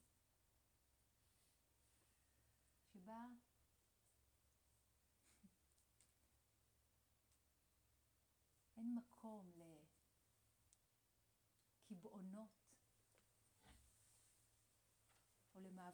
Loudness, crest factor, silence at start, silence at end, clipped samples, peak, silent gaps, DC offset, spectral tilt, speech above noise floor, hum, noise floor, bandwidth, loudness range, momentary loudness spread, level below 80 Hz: -58 LUFS; 22 dB; 0 s; 0 s; under 0.1%; -42 dBFS; none; under 0.1%; -6 dB/octave; 24 dB; none; -83 dBFS; over 20 kHz; 8 LU; 15 LU; -86 dBFS